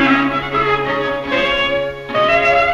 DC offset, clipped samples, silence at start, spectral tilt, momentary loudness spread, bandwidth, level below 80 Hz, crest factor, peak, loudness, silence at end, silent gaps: under 0.1%; under 0.1%; 0 s; -5.5 dB/octave; 7 LU; 12.5 kHz; -40 dBFS; 12 dB; -4 dBFS; -16 LUFS; 0 s; none